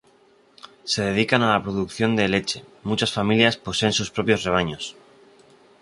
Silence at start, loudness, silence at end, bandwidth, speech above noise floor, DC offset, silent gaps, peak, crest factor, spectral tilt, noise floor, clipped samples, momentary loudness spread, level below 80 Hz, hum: 0.65 s; -22 LUFS; 0.9 s; 11.5 kHz; 35 dB; under 0.1%; none; -2 dBFS; 22 dB; -4.5 dB/octave; -57 dBFS; under 0.1%; 11 LU; -50 dBFS; none